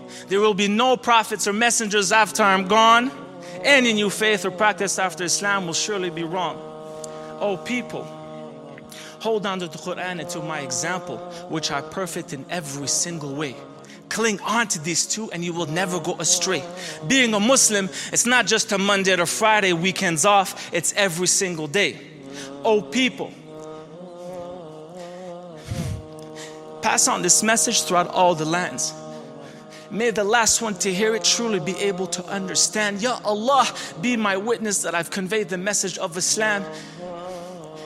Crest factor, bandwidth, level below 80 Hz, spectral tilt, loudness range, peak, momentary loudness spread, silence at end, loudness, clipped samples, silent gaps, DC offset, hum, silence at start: 22 dB; 16 kHz; -58 dBFS; -2.5 dB/octave; 10 LU; 0 dBFS; 20 LU; 0 s; -20 LUFS; under 0.1%; none; under 0.1%; none; 0 s